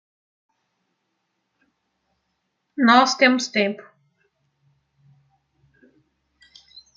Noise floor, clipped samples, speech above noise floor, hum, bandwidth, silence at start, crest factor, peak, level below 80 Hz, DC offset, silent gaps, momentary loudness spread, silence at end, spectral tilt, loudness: -75 dBFS; under 0.1%; 57 dB; none; 7.6 kHz; 2.8 s; 24 dB; -2 dBFS; -76 dBFS; under 0.1%; none; 19 LU; 3.2 s; -3 dB/octave; -18 LUFS